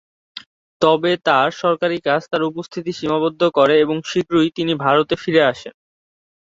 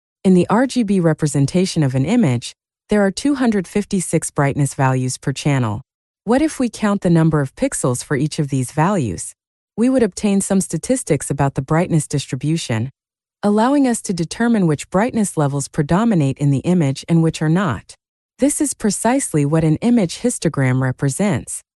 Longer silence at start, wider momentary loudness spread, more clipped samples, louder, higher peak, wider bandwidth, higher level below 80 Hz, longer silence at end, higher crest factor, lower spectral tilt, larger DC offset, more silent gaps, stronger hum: about the same, 0.35 s vs 0.25 s; first, 12 LU vs 6 LU; neither; about the same, -18 LUFS vs -18 LUFS; about the same, -2 dBFS vs -2 dBFS; second, 7.8 kHz vs 12.5 kHz; second, -60 dBFS vs -46 dBFS; first, 0.75 s vs 0.2 s; about the same, 18 dB vs 14 dB; about the same, -5.5 dB/octave vs -6 dB/octave; neither; second, 0.46-0.80 s vs 5.94-6.14 s, 9.47-9.68 s, 18.08-18.29 s; neither